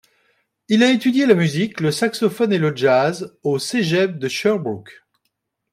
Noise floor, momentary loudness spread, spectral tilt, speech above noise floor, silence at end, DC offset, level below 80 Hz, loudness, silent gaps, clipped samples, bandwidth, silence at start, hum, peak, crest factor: -74 dBFS; 8 LU; -5.5 dB/octave; 56 dB; 0.8 s; under 0.1%; -64 dBFS; -18 LUFS; none; under 0.1%; 15.5 kHz; 0.7 s; none; -2 dBFS; 18 dB